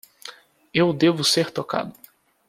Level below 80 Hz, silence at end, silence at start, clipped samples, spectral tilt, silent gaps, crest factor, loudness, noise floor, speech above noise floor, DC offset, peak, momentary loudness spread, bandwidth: -62 dBFS; 0.55 s; 0.25 s; under 0.1%; -4 dB/octave; none; 18 dB; -21 LUFS; -44 dBFS; 23 dB; under 0.1%; -6 dBFS; 22 LU; 15.5 kHz